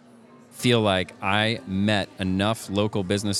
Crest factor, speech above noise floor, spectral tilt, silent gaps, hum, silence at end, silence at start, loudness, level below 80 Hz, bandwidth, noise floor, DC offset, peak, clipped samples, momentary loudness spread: 20 dB; 27 dB; -5 dB/octave; none; none; 0 s; 0.55 s; -24 LUFS; -66 dBFS; 15 kHz; -50 dBFS; under 0.1%; -4 dBFS; under 0.1%; 5 LU